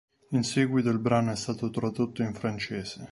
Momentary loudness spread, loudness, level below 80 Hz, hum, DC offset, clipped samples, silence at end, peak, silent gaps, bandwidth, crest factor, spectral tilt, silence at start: 7 LU; -29 LUFS; -60 dBFS; none; under 0.1%; under 0.1%; 0 s; -10 dBFS; none; 11.5 kHz; 18 dB; -6 dB/octave; 0.3 s